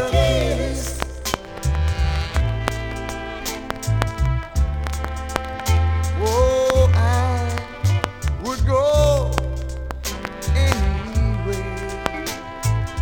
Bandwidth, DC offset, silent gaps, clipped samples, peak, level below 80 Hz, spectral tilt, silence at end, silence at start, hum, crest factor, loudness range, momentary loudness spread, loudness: 19.5 kHz; under 0.1%; none; under 0.1%; -2 dBFS; -24 dBFS; -5.5 dB/octave; 0 s; 0 s; none; 18 dB; 5 LU; 11 LU; -22 LUFS